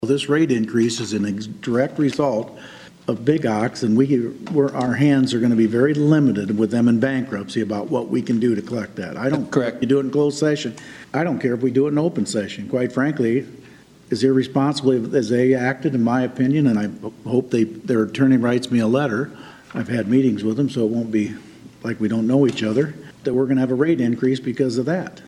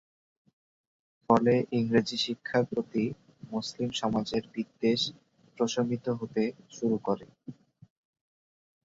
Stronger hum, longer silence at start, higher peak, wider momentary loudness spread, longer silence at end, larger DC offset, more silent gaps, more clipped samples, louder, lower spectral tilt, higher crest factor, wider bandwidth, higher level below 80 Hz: neither; second, 0 s vs 1.3 s; first, -2 dBFS vs -6 dBFS; about the same, 9 LU vs 10 LU; second, 0.05 s vs 1.35 s; neither; neither; neither; first, -20 LUFS vs -30 LUFS; about the same, -6.5 dB/octave vs -5.5 dB/octave; second, 16 dB vs 24 dB; first, 11.5 kHz vs 7.8 kHz; about the same, -62 dBFS vs -66 dBFS